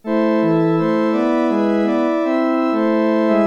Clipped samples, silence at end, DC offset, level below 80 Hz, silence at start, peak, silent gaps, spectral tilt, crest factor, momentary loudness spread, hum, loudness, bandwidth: under 0.1%; 0 s; under 0.1%; -64 dBFS; 0.05 s; -6 dBFS; none; -8 dB/octave; 10 dB; 2 LU; none; -17 LUFS; 7 kHz